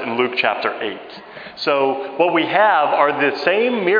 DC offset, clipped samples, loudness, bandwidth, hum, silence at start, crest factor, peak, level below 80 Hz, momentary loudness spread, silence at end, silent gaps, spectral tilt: under 0.1%; under 0.1%; -17 LUFS; 5.2 kHz; none; 0 s; 18 dB; 0 dBFS; -70 dBFS; 16 LU; 0 s; none; -6 dB/octave